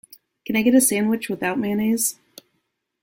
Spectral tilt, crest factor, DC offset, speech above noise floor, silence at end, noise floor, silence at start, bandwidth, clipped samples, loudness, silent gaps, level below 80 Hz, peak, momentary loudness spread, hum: -3.5 dB/octave; 18 dB; under 0.1%; 54 dB; 0.9 s; -74 dBFS; 0.5 s; 17 kHz; under 0.1%; -20 LUFS; none; -62 dBFS; -6 dBFS; 8 LU; none